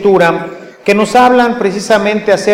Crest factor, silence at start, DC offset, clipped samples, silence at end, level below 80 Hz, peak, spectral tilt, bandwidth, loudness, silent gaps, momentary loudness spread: 10 dB; 0 s; under 0.1%; under 0.1%; 0 s; -46 dBFS; 0 dBFS; -5 dB/octave; 16.5 kHz; -10 LUFS; none; 11 LU